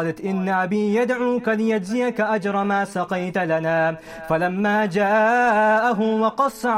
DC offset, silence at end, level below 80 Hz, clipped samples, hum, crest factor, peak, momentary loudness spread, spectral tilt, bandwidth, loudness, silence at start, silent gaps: under 0.1%; 0 s; -58 dBFS; under 0.1%; none; 14 dB; -8 dBFS; 7 LU; -6.5 dB/octave; 14.5 kHz; -20 LUFS; 0 s; none